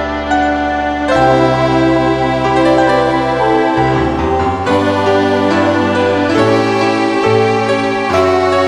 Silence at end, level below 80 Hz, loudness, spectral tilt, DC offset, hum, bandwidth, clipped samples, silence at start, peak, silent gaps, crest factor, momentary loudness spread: 0 s; -34 dBFS; -12 LUFS; -6 dB/octave; under 0.1%; none; 11.5 kHz; under 0.1%; 0 s; 0 dBFS; none; 12 dB; 3 LU